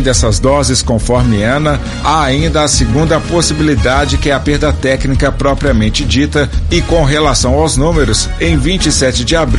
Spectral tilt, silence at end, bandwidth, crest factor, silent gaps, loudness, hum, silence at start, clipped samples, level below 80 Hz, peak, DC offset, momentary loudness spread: -4.5 dB/octave; 0 s; 11.5 kHz; 10 dB; none; -11 LUFS; none; 0 s; under 0.1%; -18 dBFS; 0 dBFS; under 0.1%; 3 LU